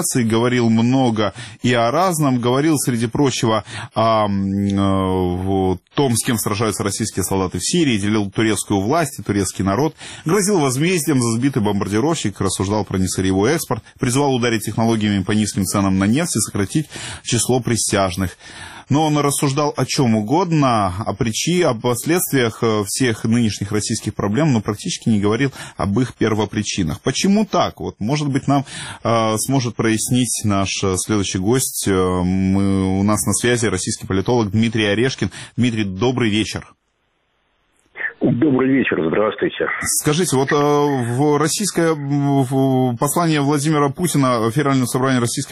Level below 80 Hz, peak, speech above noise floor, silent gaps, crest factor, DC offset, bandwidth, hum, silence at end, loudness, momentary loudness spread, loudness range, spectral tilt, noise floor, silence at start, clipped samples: -48 dBFS; -4 dBFS; 49 dB; none; 14 dB; 0.1%; 15 kHz; none; 0 s; -18 LUFS; 5 LU; 2 LU; -5 dB/octave; -66 dBFS; 0 s; under 0.1%